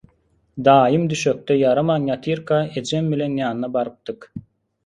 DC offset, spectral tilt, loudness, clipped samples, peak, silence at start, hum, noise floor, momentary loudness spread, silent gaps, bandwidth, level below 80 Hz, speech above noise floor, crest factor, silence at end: under 0.1%; -6 dB/octave; -19 LUFS; under 0.1%; 0 dBFS; 0.55 s; none; -62 dBFS; 19 LU; none; 11.5 kHz; -56 dBFS; 43 dB; 20 dB; 0.45 s